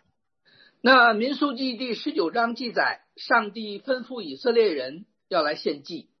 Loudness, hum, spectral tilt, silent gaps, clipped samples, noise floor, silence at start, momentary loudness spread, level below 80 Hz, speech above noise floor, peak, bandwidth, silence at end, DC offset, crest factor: -24 LUFS; none; -5 dB/octave; none; under 0.1%; -68 dBFS; 0.85 s; 16 LU; -82 dBFS; 44 dB; -4 dBFS; 6.4 kHz; 0.2 s; under 0.1%; 20 dB